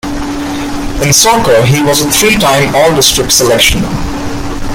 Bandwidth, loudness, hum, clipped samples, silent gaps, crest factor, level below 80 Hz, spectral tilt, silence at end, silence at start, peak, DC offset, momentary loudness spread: over 20 kHz; -8 LUFS; none; 0.3%; none; 10 dB; -24 dBFS; -3 dB/octave; 0 s; 0.05 s; 0 dBFS; under 0.1%; 12 LU